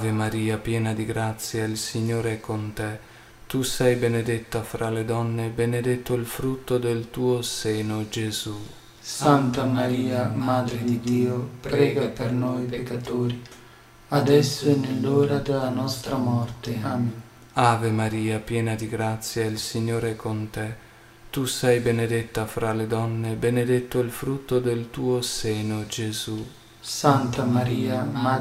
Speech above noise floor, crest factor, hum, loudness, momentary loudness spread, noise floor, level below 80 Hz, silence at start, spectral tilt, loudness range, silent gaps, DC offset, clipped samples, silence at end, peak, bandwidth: 25 dB; 22 dB; none; -25 LUFS; 9 LU; -49 dBFS; -50 dBFS; 0 s; -5.5 dB/octave; 3 LU; none; under 0.1%; under 0.1%; 0 s; -2 dBFS; 16 kHz